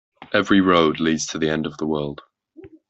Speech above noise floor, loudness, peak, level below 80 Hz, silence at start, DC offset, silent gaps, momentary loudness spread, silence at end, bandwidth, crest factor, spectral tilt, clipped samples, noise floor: 26 dB; -20 LUFS; -2 dBFS; -54 dBFS; 0.2 s; under 0.1%; none; 10 LU; 0.2 s; 8.2 kHz; 18 dB; -4.5 dB/octave; under 0.1%; -46 dBFS